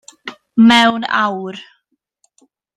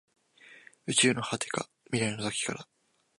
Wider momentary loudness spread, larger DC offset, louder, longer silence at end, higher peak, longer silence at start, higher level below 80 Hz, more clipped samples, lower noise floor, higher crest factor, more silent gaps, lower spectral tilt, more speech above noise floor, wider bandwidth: first, 24 LU vs 12 LU; neither; first, -13 LUFS vs -29 LUFS; first, 1.15 s vs 0.55 s; first, 0 dBFS vs -10 dBFS; second, 0.25 s vs 0.45 s; first, -60 dBFS vs -70 dBFS; neither; first, -63 dBFS vs -56 dBFS; second, 16 dB vs 22 dB; neither; first, -4.5 dB/octave vs -3 dB/octave; first, 50 dB vs 26 dB; about the same, 10.5 kHz vs 11.5 kHz